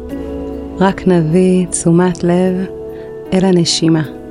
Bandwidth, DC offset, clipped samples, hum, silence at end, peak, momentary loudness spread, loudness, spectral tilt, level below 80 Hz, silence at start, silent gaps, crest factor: 11 kHz; 0.2%; under 0.1%; none; 0 s; 0 dBFS; 13 LU; -13 LUFS; -5.5 dB/octave; -38 dBFS; 0 s; none; 14 dB